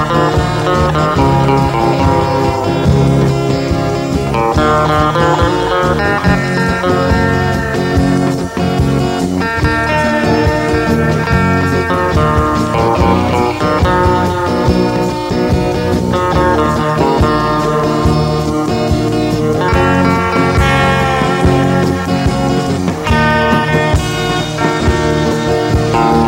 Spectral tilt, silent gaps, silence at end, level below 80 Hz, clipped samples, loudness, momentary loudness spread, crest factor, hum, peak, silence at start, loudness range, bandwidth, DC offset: -6.5 dB/octave; none; 0 s; -24 dBFS; under 0.1%; -12 LUFS; 3 LU; 12 dB; none; 0 dBFS; 0 s; 1 LU; 16.5 kHz; under 0.1%